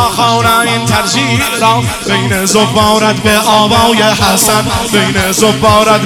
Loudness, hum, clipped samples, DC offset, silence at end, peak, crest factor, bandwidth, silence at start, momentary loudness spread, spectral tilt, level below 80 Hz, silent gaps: -9 LUFS; none; 0.5%; under 0.1%; 0 s; 0 dBFS; 10 dB; over 20 kHz; 0 s; 4 LU; -3.5 dB/octave; -32 dBFS; none